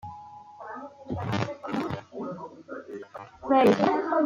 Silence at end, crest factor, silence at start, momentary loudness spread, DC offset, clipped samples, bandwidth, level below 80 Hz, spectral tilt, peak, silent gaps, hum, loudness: 0 s; 20 dB; 0.05 s; 22 LU; under 0.1%; under 0.1%; 16.5 kHz; -62 dBFS; -7 dB/octave; -8 dBFS; none; none; -26 LUFS